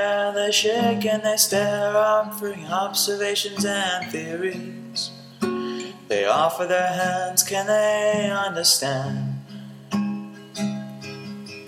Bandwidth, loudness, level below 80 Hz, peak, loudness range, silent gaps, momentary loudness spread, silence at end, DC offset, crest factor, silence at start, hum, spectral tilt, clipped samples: 17.5 kHz; -22 LUFS; -74 dBFS; -2 dBFS; 4 LU; none; 14 LU; 0 s; under 0.1%; 20 dB; 0 s; none; -3 dB/octave; under 0.1%